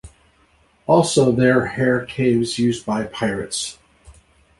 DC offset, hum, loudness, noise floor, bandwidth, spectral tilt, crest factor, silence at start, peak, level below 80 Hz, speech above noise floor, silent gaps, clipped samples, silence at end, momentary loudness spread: under 0.1%; none; -19 LUFS; -57 dBFS; 11.5 kHz; -5 dB/octave; 18 dB; 0.05 s; -2 dBFS; -50 dBFS; 39 dB; none; under 0.1%; 0.5 s; 10 LU